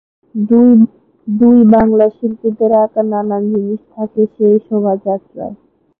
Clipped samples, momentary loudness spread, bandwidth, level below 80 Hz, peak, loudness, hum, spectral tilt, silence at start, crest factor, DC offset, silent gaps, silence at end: under 0.1%; 14 LU; 2.4 kHz; -48 dBFS; 0 dBFS; -12 LUFS; none; -13 dB/octave; 0.35 s; 12 dB; under 0.1%; none; 0.45 s